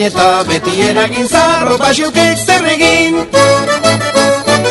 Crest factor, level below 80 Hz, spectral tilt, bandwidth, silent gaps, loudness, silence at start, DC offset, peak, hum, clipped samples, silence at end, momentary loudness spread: 10 dB; -40 dBFS; -3.5 dB/octave; 12.5 kHz; none; -10 LUFS; 0 s; under 0.1%; 0 dBFS; none; 0.4%; 0 s; 3 LU